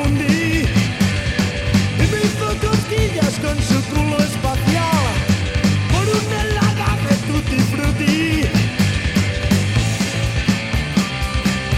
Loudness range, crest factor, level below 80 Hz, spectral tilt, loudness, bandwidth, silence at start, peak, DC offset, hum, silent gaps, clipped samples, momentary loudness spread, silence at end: 1 LU; 14 dB; -28 dBFS; -5.5 dB/octave; -18 LUFS; 16 kHz; 0 s; -2 dBFS; 0.2%; none; none; under 0.1%; 3 LU; 0 s